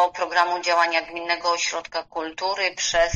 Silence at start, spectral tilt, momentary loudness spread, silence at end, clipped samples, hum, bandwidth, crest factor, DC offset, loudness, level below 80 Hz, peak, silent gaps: 0 s; -1 dB/octave; 9 LU; 0 s; under 0.1%; none; 9 kHz; 18 dB; under 0.1%; -23 LUFS; -52 dBFS; -4 dBFS; none